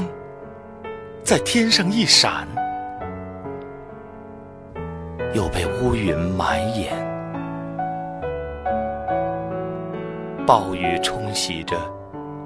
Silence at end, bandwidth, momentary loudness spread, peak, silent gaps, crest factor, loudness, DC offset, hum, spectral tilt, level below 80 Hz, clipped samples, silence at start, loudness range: 0 s; 11 kHz; 20 LU; 0 dBFS; none; 24 dB; -22 LUFS; under 0.1%; none; -3.5 dB/octave; -42 dBFS; under 0.1%; 0 s; 8 LU